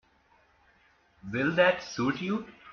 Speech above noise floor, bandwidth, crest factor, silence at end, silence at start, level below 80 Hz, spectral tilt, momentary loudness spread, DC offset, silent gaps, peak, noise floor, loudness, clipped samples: 37 dB; 6.8 kHz; 22 dB; 0 s; 1.25 s; -64 dBFS; -4 dB/octave; 12 LU; under 0.1%; none; -10 dBFS; -65 dBFS; -28 LUFS; under 0.1%